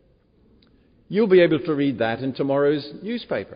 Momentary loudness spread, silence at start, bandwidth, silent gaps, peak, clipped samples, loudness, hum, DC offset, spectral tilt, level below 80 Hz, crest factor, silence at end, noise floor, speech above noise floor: 11 LU; 1.1 s; 5.2 kHz; none; -6 dBFS; under 0.1%; -21 LUFS; none; under 0.1%; -5.5 dB/octave; -60 dBFS; 18 dB; 0 s; -59 dBFS; 38 dB